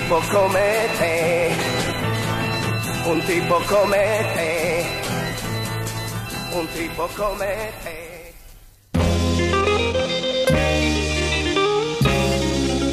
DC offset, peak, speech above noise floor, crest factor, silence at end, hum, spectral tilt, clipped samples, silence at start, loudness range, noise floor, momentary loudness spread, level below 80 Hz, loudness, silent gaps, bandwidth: under 0.1%; -4 dBFS; 25 dB; 16 dB; 0 s; none; -4.5 dB/octave; under 0.1%; 0 s; 6 LU; -45 dBFS; 8 LU; -34 dBFS; -21 LUFS; none; 15.5 kHz